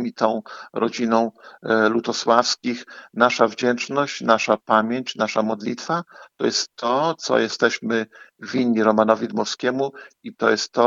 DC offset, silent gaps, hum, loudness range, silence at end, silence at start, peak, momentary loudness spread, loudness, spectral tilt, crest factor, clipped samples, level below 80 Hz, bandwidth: under 0.1%; none; none; 2 LU; 0 s; 0 s; 0 dBFS; 10 LU; -21 LUFS; -4 dB/octave; 20 dB; under 0.1%; -72 dBFS; 7.8 kHz